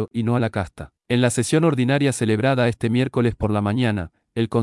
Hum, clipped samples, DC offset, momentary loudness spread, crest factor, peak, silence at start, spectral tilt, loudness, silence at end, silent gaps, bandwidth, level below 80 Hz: none; under 0.1%; under 0.1%; 9 LU; 14 dB; -6 dBFS; 0 s; -6 dB/octave; -21 LUFS; 0 s; none; 12 kHz; -48 dBFS